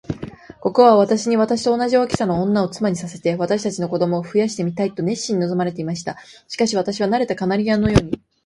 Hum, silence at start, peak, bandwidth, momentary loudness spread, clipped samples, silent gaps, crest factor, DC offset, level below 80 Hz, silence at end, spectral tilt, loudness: none; 0.1 s; 0 dBFS; 11.5 kHz; 11 LU; under 0.1%; none; 18 dB; under 0.1%; -42 dBFS; 0.3 s; -6 dB/octave; -19 LUFS